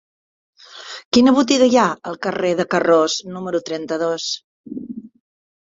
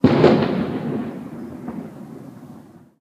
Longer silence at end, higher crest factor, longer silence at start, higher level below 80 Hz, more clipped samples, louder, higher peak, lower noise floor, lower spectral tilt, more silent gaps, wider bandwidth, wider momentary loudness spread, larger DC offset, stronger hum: first, 0.7 s vs 0.4 s; about the same, 18 dB vs 22 dB; first, 0.7 s vs 0.05 s; second, -60 dBFS vs -52 dBFS; neither; about the same, -18 LUFS vs -20 LUFS; about the same, -2 dBFS vs 0 dBFS; second, -37 dBFS vs -44 dBFS; second, -4 dB/octave vs -8.5 dB/octave; first, 1.05-1.12 s, 4.44-4.64 s vs none; second, 7.8 kHz vs 9.4 kHz; second, 20 LU vs 24 LU; neither; neither